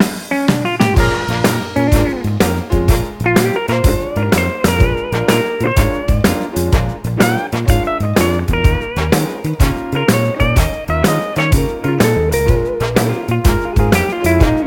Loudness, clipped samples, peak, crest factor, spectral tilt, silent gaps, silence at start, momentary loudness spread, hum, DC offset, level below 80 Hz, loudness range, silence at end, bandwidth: -15 LUFS; under 0.1%; 0 dBFS; 14 dB; -6 dB/octave; none; 0 s; 3 LU; none; under 0.1%; -20 dBFS; 1 LU; 0 s; 17 kHz